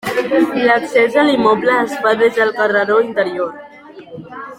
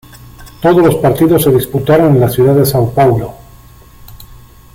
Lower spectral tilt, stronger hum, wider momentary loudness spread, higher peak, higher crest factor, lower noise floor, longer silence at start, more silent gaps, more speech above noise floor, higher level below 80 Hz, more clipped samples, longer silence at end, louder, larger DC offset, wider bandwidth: second, -5 dB/octave vs -7 dB/octave; neither; first, 13 LU vs 4 LU; about the same, -2 dBFS vs 0 dBFS; about the same, 14 dB vs 10 dB; about the same, -35 dBFS vs -38 dBFS; second, 0.05 s vs 0.4 s; neither; second, 21 dB vs 29 dB; second, -58 dBFS vs -36 dBFS; neither; second, 0.05 s vs 0.4 s; second, -14 LUFS vs -10 LUFS; neither; about the same, 16 kHz vs 16.5 kHz